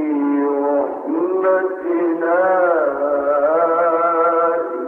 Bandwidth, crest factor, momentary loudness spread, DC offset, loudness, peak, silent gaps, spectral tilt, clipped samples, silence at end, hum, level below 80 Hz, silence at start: 3.5 kHz; 10 dB; 4 LU; under 0.1%; -17 LUFS; -6 dBFS; none; -8.5 dB/octave; under 0.1%; 0 s; none; -64 dBFS; 0 s